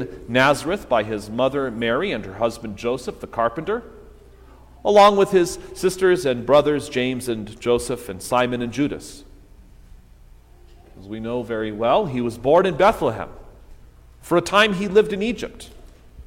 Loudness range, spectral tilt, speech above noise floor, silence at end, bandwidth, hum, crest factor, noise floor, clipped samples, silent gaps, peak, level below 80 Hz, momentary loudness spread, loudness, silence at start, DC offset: 9 LU; -5 dB/octave; 27 dB; 0.05 s; 16.5 kHz; none; 18 dB; -47 dBFS; under 0.1%; none; -2 dBFS; -46 dBFS; 12 LU; -20 LUFS; 0 s; under 0.1%